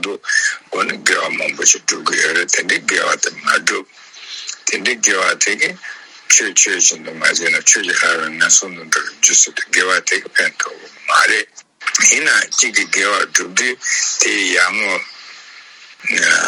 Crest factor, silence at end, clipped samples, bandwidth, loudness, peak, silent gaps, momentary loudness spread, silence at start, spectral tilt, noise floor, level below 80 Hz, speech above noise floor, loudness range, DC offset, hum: 16 dB; 0 s; under 0.1%; over 20 kHz; -13 LUFS; 0 dBFS; none; 9 LU; 0 s; 1 dB/octave; -40 dBFS; -70 dBFS; 24 dB; 3 LU; under 0.1%; none